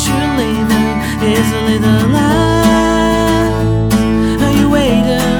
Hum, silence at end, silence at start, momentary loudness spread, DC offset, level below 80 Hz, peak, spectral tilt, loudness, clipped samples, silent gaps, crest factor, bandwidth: none; 0 s; 0 s; 3 LU; under 0.1%; -24 dBFS; 0 dBFS; -5.5 dB/octave; -12 LUFS; under 0.1%; none; 12 dB; over 20 kHz